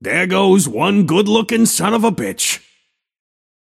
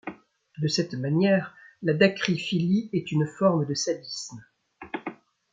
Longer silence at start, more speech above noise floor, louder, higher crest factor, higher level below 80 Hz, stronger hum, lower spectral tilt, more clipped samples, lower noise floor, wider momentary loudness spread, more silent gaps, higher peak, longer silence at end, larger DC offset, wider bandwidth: about the same, 0 s vs 0.05 s; first, 48 dB vs 23 dB; first, -15 LUFS vs -26 LUFS; about the same, 16 dB vs 20 dB; first, -58 dBFS vs -68 dBFS; neither; second, -4 dB/octave vs -5.5 dB/octave; neither; first, -63 dBFS vs -48 dBFS; second, 5 LU vs 15 LU; neither; first, 0 dBFS vs -6 dBFS; first, 1.05 s vs 0.4 s; neither; first, 16 kHz vs 9 kHz